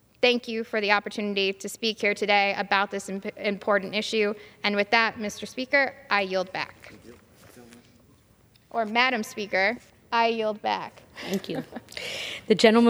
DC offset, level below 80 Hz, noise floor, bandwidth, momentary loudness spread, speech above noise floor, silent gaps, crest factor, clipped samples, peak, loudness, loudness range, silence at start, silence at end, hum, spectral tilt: under 0.1%; -68 dBFS; -59 dBFS; over 20 kHz; 12 LU; 34 dB; none; 24 dB; under 0.1%; -4 dBFS; -26 LUFS; 5 LU; 0.2 s; 0 s; none; -4 dB/octave